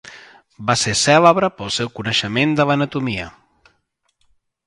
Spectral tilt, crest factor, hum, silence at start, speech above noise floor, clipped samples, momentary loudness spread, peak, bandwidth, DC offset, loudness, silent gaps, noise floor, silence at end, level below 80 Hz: -4 dB/octave; 20 dB; none; 0.05 s; 50 dB; under 0.1%; 13 LU; 0 dBFS; 11.5 kHz; under 0.1%; -17 LUFS; none; -68 dBFS; 1.35 s; -50 dBFS